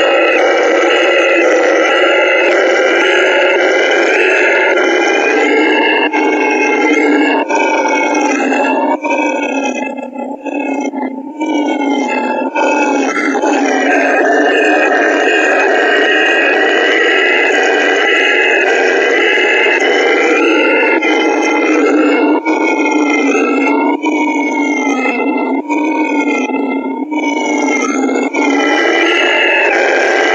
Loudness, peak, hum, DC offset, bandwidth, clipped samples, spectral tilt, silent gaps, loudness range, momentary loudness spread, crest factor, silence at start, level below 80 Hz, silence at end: -11 LUFS; 0 dBFS; none; under 0.1%; 8.2 kHz; under 0.1%; -1.5 dB/octave; none; 5 LU; 6 LU; 10 dB; 0 s; -74 dBFS; 0 s